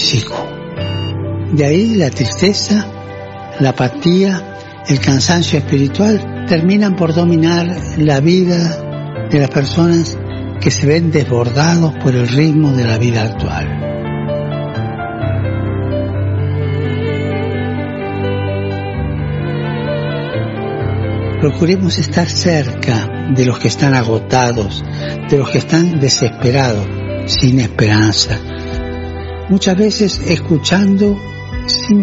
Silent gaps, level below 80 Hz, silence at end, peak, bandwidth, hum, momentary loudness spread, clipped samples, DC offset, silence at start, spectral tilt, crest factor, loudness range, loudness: none; -34 dBFS; 0 s; 0 dBFS; 8 kHz; none; 10 LU; under 0.1%; under 0.1%; 0 s; -5.5 dB/octave; 14 dB; 5 LU; -14 LUFS